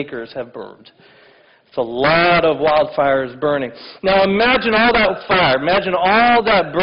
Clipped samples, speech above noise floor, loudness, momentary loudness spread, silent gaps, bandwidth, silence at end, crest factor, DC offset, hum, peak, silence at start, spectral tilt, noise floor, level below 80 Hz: under 0.1%; 34 dB; -15 LUFS; 16 LU; none; 5.8 kHz; 0 s; 12 dB; under 0.1%; none; -4 dBFS; 0 s; -8 dB/octave; -50 dBFS; -44 dBFS